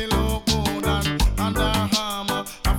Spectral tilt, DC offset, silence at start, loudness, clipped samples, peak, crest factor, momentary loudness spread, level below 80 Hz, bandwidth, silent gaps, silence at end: -4.5 dB/octave; under 0.1%; 0 s; -23 LUFS; under 0.1%; -8 dBFS; 14 dB; 4 LU; -26 dBFS; 17.5 kHz; none; 0 s